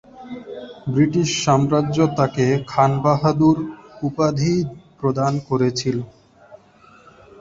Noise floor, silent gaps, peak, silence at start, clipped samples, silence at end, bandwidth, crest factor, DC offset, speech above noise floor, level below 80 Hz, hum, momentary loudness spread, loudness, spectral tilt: -50 dBFS; none; -2 dBFS; 0.15 s; under 0.1%; 0.85 s; 7.8 kHz; 18 dB; under 0.1%; 32 dB; -50 dBFS; none; 15 LU; -19 LUFS; -6.5 dB/octave